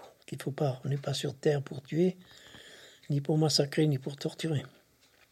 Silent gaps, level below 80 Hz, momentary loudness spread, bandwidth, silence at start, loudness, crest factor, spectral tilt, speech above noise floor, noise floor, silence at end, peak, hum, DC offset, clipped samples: none; -72 dBFS; 23 LU; 14.5 kHz; 0 s; -31 LUFS; 18 dB; -5.5 dB/octave; 34 dB; -65 dBFS; 0.65 s; -14 dBFS; none; under 0.1%; under 0.1%